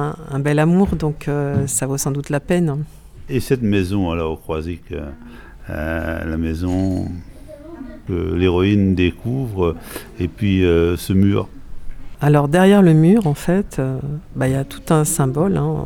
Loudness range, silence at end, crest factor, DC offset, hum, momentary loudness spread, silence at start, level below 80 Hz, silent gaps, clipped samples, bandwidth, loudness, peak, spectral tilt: 8 LU; 0 s; 16 dB; under 0.1%; none; 16 LU; 0 s; -36 dBFS; none; under 0.1%; 18 kHz; -18 LUFS; 0 dBFS; -6.5 dB/octave